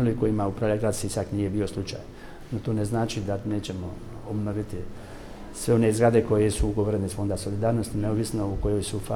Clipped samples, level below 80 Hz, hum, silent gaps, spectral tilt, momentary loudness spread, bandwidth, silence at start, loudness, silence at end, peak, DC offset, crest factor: under 0.1%; -40 dBFS; none; none; -6.5 dB/octave; 16 LU; 16 kHz; 0 s; -26 LUFS; 0 s; -8 dBFS; under 0.1%; 18 dB